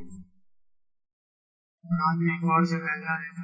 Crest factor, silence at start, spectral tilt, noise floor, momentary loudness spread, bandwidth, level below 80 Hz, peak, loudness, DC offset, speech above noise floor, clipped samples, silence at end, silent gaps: 20 dB; 0 s; -8 dB/octave; under -90 dBFS; 7 LU; 8 kHz; -68 dBFS; -10 dBFS; -26 LUFS; under 0.1%; over 64 dB; under 0.1%; 0 s; 1.13-1.78 s